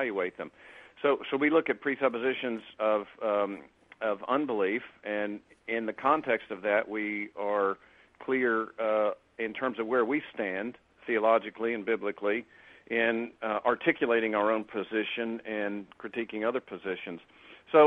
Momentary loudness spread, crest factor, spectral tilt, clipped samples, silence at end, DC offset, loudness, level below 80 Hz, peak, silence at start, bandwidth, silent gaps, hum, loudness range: 10 LU; 22 dB; -7 dB/octave; under 0.1%; 0 s; under 0.1%; -30 LUFS; -74 dBFS; -8 dBFS; 0 s; 4.2 kHz; none; none; 2 LU